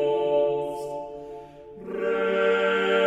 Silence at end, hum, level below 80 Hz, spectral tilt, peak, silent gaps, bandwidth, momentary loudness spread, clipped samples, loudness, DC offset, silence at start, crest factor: 0 s; none; -60 dBFS; -5 dB/octave; -10 dBFS; none; 10.5 kHz; 19 LU; under 0.1%; -25 LUFS; under 0.1%; 0 s; 16 dB